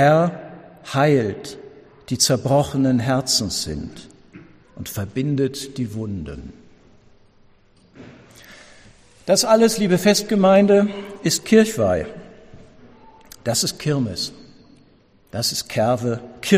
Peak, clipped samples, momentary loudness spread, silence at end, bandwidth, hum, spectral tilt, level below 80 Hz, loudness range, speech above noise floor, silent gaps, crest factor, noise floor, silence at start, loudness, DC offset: -2 dBFS; under 0.1%; 18 LU; 0 s; 15.5 kHz; none; -4.5 dB/octave; -50 dBFS; 11 LU; 36 dB; none; 18 dB; -54 dBFS; 0 s; -19 LUFS; under 0.1%